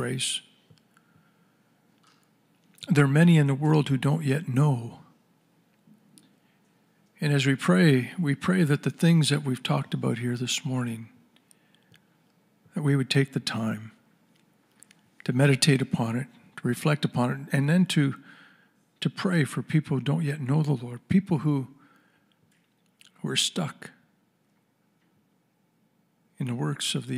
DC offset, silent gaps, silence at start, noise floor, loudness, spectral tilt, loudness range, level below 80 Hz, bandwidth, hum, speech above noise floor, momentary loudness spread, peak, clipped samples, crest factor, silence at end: under 0.1%; none; 0 s; -69 dBFS; -25 LUFS; -5.5 dB/octave; 9 LU; -70 dBFS; 15 kHz; none; 45 dB; 13 LU; -8 dBFS; under 0.1%; 18 dB; 0 s